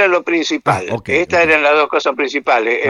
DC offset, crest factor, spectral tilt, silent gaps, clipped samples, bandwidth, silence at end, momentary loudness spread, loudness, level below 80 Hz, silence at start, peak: under 0.1%; 14 dB; -4.5 dB/octave; none; under 0.1%; 11.5 kHz; 0 s; 6 LU; -14 LUFS; -50 dBFS; 0 s; 0 dBFS